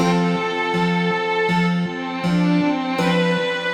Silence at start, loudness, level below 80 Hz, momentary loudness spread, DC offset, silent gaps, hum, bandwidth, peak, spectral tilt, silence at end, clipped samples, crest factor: 0 s; -20 LUFS; -54 dBFS; 3 LU; under 0.1%; none; none; 9.6 kHz; -6 dBFS; -6.5 dB/octave; 0 s; under 0.1%; 14 dB